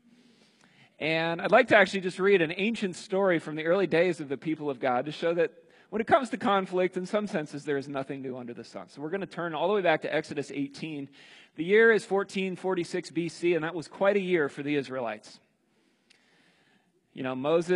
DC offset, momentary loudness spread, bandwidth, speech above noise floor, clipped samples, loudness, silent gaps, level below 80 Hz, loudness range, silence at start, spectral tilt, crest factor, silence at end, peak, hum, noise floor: under 0.1%; 14 LU; 11.5 kHz; 42 dB; under 0.1%; -28 LUFS; none; -76 dBFS; 6 LU; 1 s; -5.5 dB/octave; 24 dB; 0 s; -6 dBFS; none; -69 dBFS